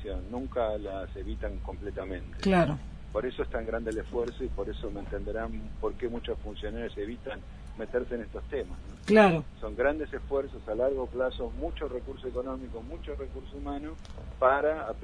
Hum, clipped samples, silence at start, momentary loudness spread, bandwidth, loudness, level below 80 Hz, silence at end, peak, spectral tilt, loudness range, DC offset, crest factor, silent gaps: none; under 0.1%; 0 s; 15 LU; 10.5 kHz; -32 LUFS; -42 dBFS; 0 s; -8 dBFS; -7 dB/octave; 8 LU; under 0.1%; 22 dB; none